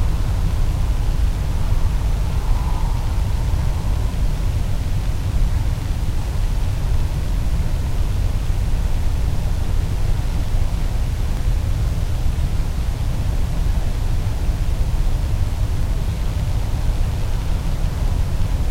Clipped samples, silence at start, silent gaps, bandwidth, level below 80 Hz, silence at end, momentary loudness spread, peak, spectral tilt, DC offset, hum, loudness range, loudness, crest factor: under 0.1%; 0 s; none; 15.5 kHz; -20 dBFS; 0 s; 2 LU; -6 dBFS; -6.5 dB/octave; under 0.1%; none; 1 LU; -23 LUFS; 12 dB